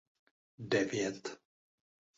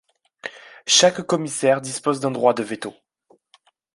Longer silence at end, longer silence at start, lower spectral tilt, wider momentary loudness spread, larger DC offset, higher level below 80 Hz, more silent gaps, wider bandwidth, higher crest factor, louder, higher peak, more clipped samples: second, 0.8 s vs 1.05 s; first, 0.6 s vs 0.45 s; first, -4 dB/octave vs -2.5 dB/octave; about the same, 19 LU vs 21 LU; neither; second, -76 dBFS vs -68 dBFS; neither; second, 8 kHz vs 11.5 kHz; about the same, 20 dB vs 20 dB; second, -35 LUFS vs -19 LUFS; second, -18 dBFS vs -2 dBFS; neither